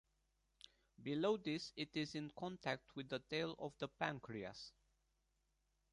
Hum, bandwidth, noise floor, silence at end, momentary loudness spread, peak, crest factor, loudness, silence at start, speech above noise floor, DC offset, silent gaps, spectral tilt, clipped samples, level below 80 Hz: none; 11 kHz; -84 dBFS; 1.25 s; 18 LU; -24 dBFS; 24 dB; -45 LUFS; 1 s; 39 dB; under 0.1%; none; -5.5 dB/octave; under 0.1%; -78 dBFS